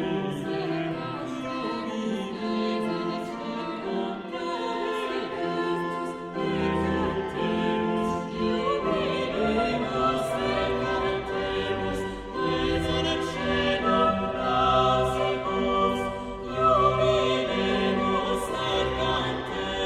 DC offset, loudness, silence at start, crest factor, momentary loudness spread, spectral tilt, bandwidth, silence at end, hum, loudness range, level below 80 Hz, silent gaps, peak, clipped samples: under 0.1%; -27 LUFS; 0 s; 16 dB; 9 LU; -5.5 dB/octave; 13.5 kHz; 0 s; none; 6 LU; -46 dBFS; none; -10 dBFS; under 0.1%